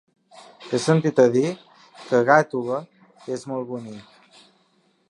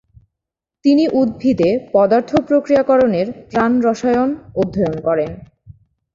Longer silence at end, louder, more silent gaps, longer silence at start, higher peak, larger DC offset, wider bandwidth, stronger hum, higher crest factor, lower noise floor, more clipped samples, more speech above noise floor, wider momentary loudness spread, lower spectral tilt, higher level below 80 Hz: first, 1.1 s vs 0.75 s; second, -21 LUFS vs -16 LUFS; neither; second, 0.6 s vs 0.85 s; about the same, -2 dBFS vs -2 dBFS; neither; first, 11 kHz vs 7.4 kHz; neither; first, 22 dB vs 14 dB; second, -64 dBFS vs -84 dBFS; neither; second, 43 dB vs 68 dB; first, 22 LU vs 7 LU; second, -6 dB/octave vs -7.5 dB/octave; second, -72 dBFS vs -48 dBFS